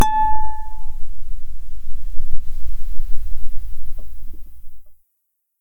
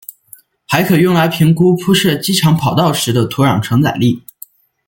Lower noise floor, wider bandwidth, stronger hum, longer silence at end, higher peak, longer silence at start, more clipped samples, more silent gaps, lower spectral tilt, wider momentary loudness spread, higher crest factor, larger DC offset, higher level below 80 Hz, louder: first, -72 dBFS vs -43 dBFS; second, 6.4 kHz vs 17 kHz; neither; about the same, 0.75 s vs 0.7 s; about the same, -2 dBFS vs 0 dBFS; second, 0 s vs 0.7 s; neither; neither; about the same, -4.5 dB/octave vs -5.5 dB/octave; first, 18 LU vs 5 LU; about the same, 10 dB vs 14 dB; neither; first, -24 dBFS vs -48 dBFS; second, -30 LUFS vs -13 LUFS